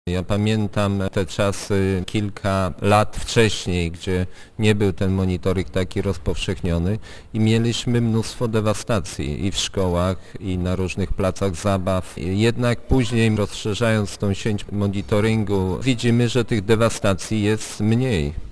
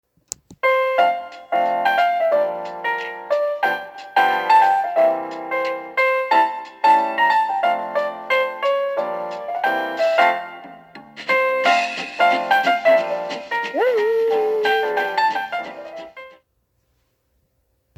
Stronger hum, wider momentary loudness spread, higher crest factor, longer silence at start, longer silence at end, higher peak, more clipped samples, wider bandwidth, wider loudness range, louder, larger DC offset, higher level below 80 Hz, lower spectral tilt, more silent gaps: neither; second, 6 LU vs 11 LU; about the same, 18 dB vs 18 dB; second, 0.05 s vs 0.5 s; second, 0 s vs 1.65 s; about the same, -2 dBFS vs -2 dBFS; neither; second, 11 kHz vs 15 kHz; about the same, 2 LU vs 3 LU; about the same, -21 LUFS vs -19 LUFS; neither; first, -36 dBFS vs -70 dBFS; first, -6 dB/octave vs -2.5 dB/octave; neither